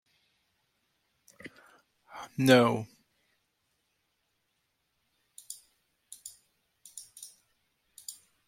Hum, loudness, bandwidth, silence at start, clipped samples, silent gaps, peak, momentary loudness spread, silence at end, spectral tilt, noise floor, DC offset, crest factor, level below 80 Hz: none; -25 LUFS; 16.5 kHz; 1.45 s; under 0.1%; none; -6 dBFS; 27 LU; 0.35 s; -5 dB/octave; -78 dBFS; under 0.1%; 28 dB; -76 dBFS